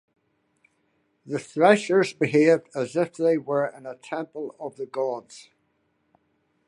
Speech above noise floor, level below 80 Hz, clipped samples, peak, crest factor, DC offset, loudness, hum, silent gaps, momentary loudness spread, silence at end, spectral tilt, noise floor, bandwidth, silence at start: 47 dB; -76 dBFS; under 0.1%; -4 dBFS; 22 dB; under 0.1%; -24 LUFS; none; none; 16 LU; 1.25 s; -6 dB/octave; -71 dBFS; 11.5 kHz; 1.25 s